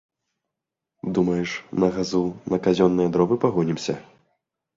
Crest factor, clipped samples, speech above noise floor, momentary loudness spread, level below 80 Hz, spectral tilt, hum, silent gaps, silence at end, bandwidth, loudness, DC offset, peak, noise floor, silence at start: 18 dB; under 0.1%; 63 dB; 9 LU; -56 dBFS; -6.5 dB/octave; none; none; 0.75 s; 7.6 kHz; -23 LUFS; under 0.1%; -6 dBFS; -85 dBFS; 1.05 s